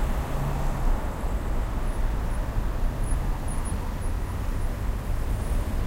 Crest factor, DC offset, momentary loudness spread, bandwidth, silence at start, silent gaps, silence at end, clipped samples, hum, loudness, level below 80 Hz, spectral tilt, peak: 14 dB; under 0.1%; 2 LU; 16 kHz; 0 s; none; 0 s; under 0.1%; none; -31 LUFS; -26 dBFS; -6.5 dB/octave; -12 dBFS